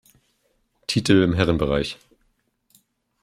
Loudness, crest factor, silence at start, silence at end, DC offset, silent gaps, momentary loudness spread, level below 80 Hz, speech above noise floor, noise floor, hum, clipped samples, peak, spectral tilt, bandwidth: -21 LUFS; 22 dB; 0.9 s; 1.3 s; under 0.1%; none; 16 LU; -44 dBFS; 49 dB; -68 dBFS; none; under 0.1%; -2 dBFS; -6 dB/octave; 15 kHz